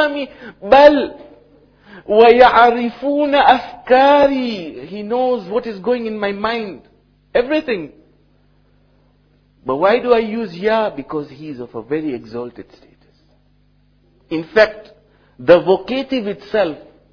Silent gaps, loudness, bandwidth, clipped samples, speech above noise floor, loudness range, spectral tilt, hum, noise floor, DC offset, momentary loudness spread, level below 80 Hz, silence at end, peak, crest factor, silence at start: none; -15 LUFS; 5.4 kHz; 0.3%; 40 dB; 11 LU; -6.5 dB/octave; 50 Hz at -60 dBFS; -55 dBFS; under 0.1%; 20 LU; -50 dBFS; 0.35 s; 0 dBFS; 16 dB; 0 s